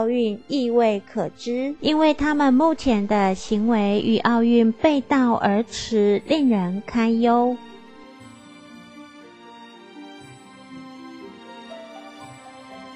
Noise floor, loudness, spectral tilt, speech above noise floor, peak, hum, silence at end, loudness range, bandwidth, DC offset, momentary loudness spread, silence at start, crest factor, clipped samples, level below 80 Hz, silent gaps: -44 dBFS; -20 LUFS; -6 dB/octave; 25 dB; -4 dBFS; none; 0 s; 22 LU; 8.6 kHz; under 0.1%; 23 LU; 0 s; 16 dB; under 0.1%; -50 dBFS; none